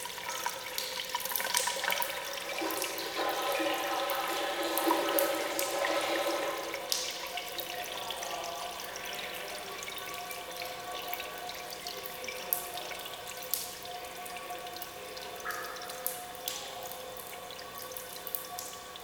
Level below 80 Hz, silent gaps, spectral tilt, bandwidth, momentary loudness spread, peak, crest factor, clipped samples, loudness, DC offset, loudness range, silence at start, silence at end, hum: -68 dBFS; none; -1 dB/octave; over 20 kHz; 11 LU; -4 dBFS; 32 dB; under 0.1%; -35 LUFS; under 0.1%; 8 LU; 0 s; 0 s; none